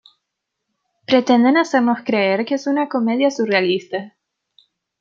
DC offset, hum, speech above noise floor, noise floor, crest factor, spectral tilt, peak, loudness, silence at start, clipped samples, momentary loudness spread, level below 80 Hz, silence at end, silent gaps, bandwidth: under 0.1%; none; 62 dB; -79 dBFS; 16 dB; -5 dB/octave; -2 dBFS; -17 LUFS; 1.1 s; under 0.1%; 9 LU; -68 dBFS; 0.9 s; none; 7.6 kHz